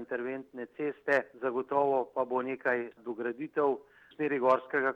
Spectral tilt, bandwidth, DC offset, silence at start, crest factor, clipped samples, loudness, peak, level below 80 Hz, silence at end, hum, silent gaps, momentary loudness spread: -7 dB/octave; 8.2 kHz; under 0.1%; 0 s; 18 dB; under 0.1%; -32 LUFS; -14 dBFS; -82 dBFS; 0 s; none; none; 10 LU